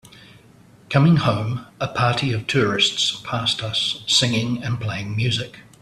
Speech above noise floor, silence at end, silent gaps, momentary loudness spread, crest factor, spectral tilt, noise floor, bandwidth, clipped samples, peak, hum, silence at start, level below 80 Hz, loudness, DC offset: 29 dB; 0.2 s; none; 9 LU; 20 dB; -4.5 dB/octave; -50 dBFS; 13 kHz; under 0.1%; -2 dBFS; none; 0.15 s; -52 dBFS; -20 LUFS; under 0.1%